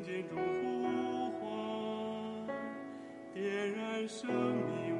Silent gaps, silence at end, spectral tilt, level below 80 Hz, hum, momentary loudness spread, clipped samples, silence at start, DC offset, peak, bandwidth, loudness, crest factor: none; 0 s; -6 dB/octave; -78 dBFS; none; 8 LU; under 0.1%; 0 s; under 0.1%; -22 dBFS; 11 kHz; -38 LUFS; 16 dB